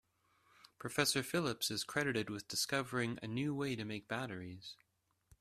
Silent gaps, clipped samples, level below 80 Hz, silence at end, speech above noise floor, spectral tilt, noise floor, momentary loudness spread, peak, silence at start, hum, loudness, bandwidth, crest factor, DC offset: none; under 0.1%; -72 dBFS; 0.65 s; 35 dB; -3.5 dB/octave; -74 dBFS; 13 LU; -16 dBFS; 0.65 s; none; -38 LUFS; 15.5 kHz; 24 dB; under 0.1%